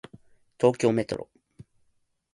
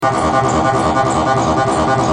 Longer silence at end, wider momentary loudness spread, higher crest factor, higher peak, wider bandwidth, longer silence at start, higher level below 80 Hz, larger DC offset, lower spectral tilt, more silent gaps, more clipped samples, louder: first, 0.7 s vs 0 s; first, 15 LU vs 0 LU; first, 22 dB vs 12 dB; second, -6 dBFS vs -2 dBFS; about the same, 11.5 kHz vs 10.5 kHz; first, 0.6 s vs 0 s; second, -62 dBFS vs -36 dBFS; neither; about the same, -6.5 dB/octave vs -5.5 dB/octave; neither; neither; second, -26 LUFS vs -14 LUFS